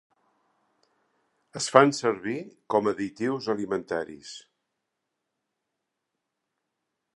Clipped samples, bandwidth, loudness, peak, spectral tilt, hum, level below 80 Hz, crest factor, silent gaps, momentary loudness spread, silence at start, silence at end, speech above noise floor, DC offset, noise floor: under 0.1%; 11.5 kHz; -26 LUFS; 0 dBFS; -4.5 dB/octave; none; -72 dBFS; 28 dB; none; 22 LU; 1.55 s; 2.75 s; 57 dB; under 0.1%; -83 dBFS